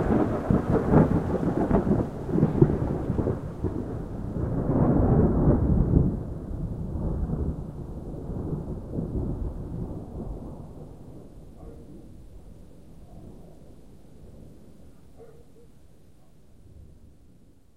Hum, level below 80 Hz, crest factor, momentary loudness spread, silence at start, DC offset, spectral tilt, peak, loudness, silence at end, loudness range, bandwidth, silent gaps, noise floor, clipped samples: none; -36 dBFS; 24 dB; 24 LU; 0 s; 0.3%; -10.5 dB/octave; -2 dBFS; -26 LUFS; 0.7 s; 22 LU; 10 kHz; none; -56 dBFS; under 0.1%